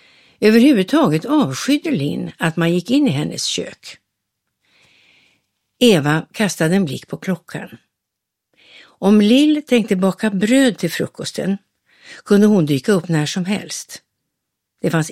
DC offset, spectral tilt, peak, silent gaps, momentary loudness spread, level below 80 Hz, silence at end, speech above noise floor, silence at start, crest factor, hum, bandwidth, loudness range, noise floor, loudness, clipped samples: under 0.1%; -5.5 dB/octave; 0 dBFS; none; 14 LU; -62 dBFS; 0 s; 64 dB; 0.4 s; 18 dB; none; 14.5 kHz; 5 LU; -80 dBFS; -17 LUFS; under 0.1%